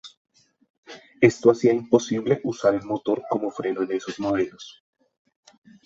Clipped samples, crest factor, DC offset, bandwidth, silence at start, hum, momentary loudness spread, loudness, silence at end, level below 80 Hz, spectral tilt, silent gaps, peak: under 0.1%; 22 dB; under 0.1%; 7.8 kHz; 0.05 s; none; 9 LU; -23 LUFS; 1.15 s; -62 dBFS; -6 dB/octave; 0.17-0.25 s, 0.70-0.83 s; -2 dBFS